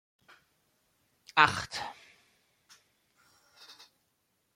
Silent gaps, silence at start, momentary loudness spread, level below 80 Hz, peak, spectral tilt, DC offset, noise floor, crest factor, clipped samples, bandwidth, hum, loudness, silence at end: none; 1.35 s; 28 LU; -68 dBFS; -4 dBFS; -2.5 dB/octave; under 0.1%; -77 dBFS; 32 dB; under 0.1%; 16.5 kHz; none; -28 LUFS; 0.85 s